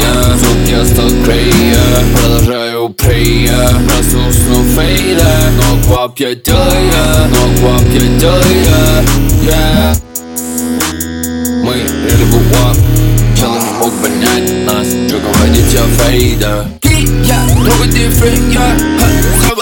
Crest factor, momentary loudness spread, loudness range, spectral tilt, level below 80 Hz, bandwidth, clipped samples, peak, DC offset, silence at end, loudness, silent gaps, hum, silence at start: 8 dB; 5 LU; 2 LU; -5 dB/octave; -14 dBFS; over 20 kHz; 0.6%; 0 dBFS; under 0.1%; 0 s; -9 LUFS; none; none; 0 s